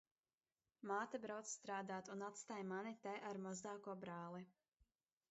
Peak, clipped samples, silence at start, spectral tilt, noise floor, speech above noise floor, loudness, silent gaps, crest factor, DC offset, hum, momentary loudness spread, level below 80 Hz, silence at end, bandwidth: -34 dBFS; under 0.1%; 0.8 s; -4.5 dB/octave; under -90 dBFS; over 40 dB; -50 LUFS; none; 18 dB; under 0.1%; none; 7 LU; under -90 dBFS; 0.8 s; 8 kHz